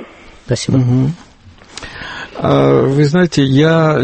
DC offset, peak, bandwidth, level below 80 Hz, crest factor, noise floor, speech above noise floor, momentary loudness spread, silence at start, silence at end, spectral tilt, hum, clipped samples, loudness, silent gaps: under 0.1%; 0 dBFS; 8.8 kHz; -42 dBFS; 12 dB; -41 dBFS; 30 dB; 18 LU; 0 s; 0 s; -7 dB/octave; none; under 0.1%; -13 LUFS; none